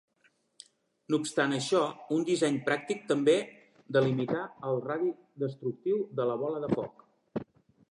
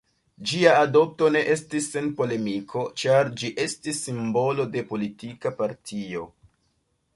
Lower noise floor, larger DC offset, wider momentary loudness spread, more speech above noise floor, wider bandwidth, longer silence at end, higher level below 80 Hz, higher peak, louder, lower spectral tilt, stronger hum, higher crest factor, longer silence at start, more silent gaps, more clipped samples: about the same, -70 dBFS vs -71 dBFS; neither; second, 9 LU vs 14 LU; second, 41 dB vs 47 dB; about the same, 11.5 kHz vs 11.5 kHz; second, 0.5 s vs 0.9 s; second, -72 dBFS vs -64 dBFS; second, -12 dBFS vs -2 dBFS; second, -31 LUFS vs -24 LUFS; about the same, -5.5 dB/octave vs -4.5 dB/octave; neither; about the same, 18 dB vs 22 dB; first, 1.1 s vs 0.4 s; neither; neither